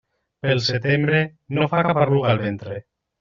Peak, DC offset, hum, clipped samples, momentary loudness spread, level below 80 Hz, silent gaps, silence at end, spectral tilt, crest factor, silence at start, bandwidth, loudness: -4 dBFS; under 0.1%; none; under 0.1%; 11 LU; -56 dBFS; none; 0.4 s; -5 dB/octave; 18 dB; 0.45 s; 7.4 kHz; -20 LUFS